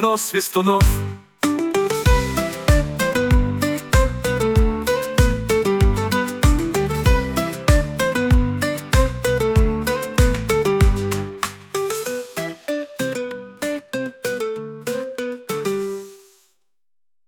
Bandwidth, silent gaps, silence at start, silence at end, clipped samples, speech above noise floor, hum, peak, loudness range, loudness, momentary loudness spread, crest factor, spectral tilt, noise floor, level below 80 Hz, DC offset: 19.5 kHz; none; 0 s; 1.1 s; under 0.1%; 63 dB; none; -4 dBFS; 8 LU; -20 LUFS; 9 LU; 16 dB; -5.5 dB/octave; -80 dBFS; -24 dBFS; under 0.1%